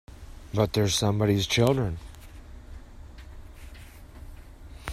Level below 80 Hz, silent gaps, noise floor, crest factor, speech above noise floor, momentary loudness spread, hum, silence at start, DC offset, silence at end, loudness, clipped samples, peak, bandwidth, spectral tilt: -44 dBFS; none; -45 dBFS; 20 dB; 21 dB; 25 LU; none; 0.1 s; under 0.1%; 0 s; -25 LUFS; under 0.1%; -8 dBFS; 14.5 kHz; -5 dB/octave